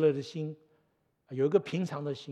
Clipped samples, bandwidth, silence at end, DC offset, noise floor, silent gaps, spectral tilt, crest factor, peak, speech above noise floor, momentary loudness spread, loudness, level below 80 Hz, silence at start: under 0.1%; 9.6 kHz; 0 s; under 0.1%; -74 dBFS; none; -7.5 dB/octave; 20 dB; -12 dBFS; 44 dB; 13 LU; -32 LUFS; -84 dBFS; 0 s